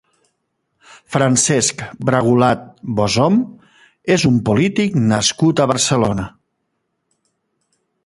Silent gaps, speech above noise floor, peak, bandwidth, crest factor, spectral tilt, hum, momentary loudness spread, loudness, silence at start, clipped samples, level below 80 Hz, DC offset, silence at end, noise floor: none; 56 dB; 0 dBFS; 11.5 kHz; 18 dB; -4.5 dB/octave; none; 10 LU; -16 LUFS; 1.1 s; under 0.1%; -46 dBFS; under 0.1%; 1.75 s; -71 dBFS